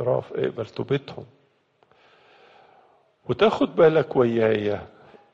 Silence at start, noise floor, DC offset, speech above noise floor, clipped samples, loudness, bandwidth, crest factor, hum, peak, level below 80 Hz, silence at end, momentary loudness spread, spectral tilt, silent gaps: 0 s; -63 dBFS; under 0.1%; 41 dB; under 0.1%; -22 LUFS; 7.4 kHz; 20 dB; none; -4 dBFS; -62 dBFS; 0.45 s; 15 LU; -7.5 dB/octave; none